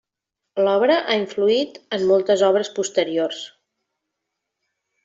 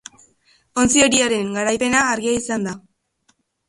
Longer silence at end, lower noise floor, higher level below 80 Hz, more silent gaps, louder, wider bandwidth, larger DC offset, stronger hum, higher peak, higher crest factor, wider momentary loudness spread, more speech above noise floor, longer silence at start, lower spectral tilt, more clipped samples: first, 1.55 s vs 0.9 s; first, -82 dBFS vs -64 dBFS; second, -70 dBFS vs -50 dBFS; neither; about the same, -20 LUFS vs -18 LUFS; second, 8 kHz vs 11.5 kHz; neither; neither; about the same, -4 dBFS vs -2 dBFS; about the same, 18 dB vs 20 dB; second, 10 LU vs 13 LU; first, 63 dB vs 46 dB; second, 0.55 s vs 0.75 s; first, -4 dB/octave vs -2.5 dB/octave; neither